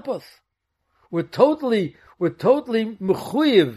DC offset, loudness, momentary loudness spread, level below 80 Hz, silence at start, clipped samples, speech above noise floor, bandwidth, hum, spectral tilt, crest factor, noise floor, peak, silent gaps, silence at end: under 0.1%; -21 LUFS; 12 LU; -64 dBFS; 0.05 s; under 0.1%; 54 dB; 13.5 kHz; none; -6.5 dB/octave; 20 dB; -74 dBFS; -2 dBFS; none; 0 s